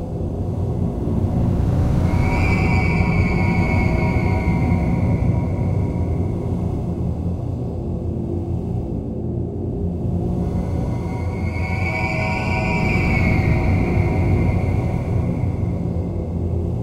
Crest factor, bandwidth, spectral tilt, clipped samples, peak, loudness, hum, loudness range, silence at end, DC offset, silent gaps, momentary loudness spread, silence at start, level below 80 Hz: 16 dB; 9.4 kHz; -8.5 dB/octave; under 0.1%; -4 dBFS; -21 LUFS; none; 6 LU; 0 s; under 0.1%; none; 7 LU; 0 s; -28 dBFS